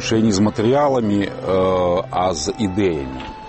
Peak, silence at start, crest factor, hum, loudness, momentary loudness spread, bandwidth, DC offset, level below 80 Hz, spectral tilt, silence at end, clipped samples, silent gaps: -6 dBFS; 0 s; 12 dB; none; -18 LUFS; 5 LU; 8.8 kHz; under 0.1%; -42 dBFS; -5.5 dB/octave; 0 s; under 0.1%; none